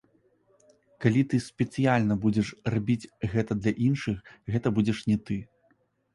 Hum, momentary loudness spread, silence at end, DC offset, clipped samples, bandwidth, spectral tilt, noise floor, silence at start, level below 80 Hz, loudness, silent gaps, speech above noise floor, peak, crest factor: none; 7 LU; 0.7 s; under 0.1%; under 0.1%; 11.5 kHz; -7.5 dB/octave; -68 dBFS; 1 s; -54 dBFS; -28 LUFS; none; 42 dB; -8 dBFS; 20 dB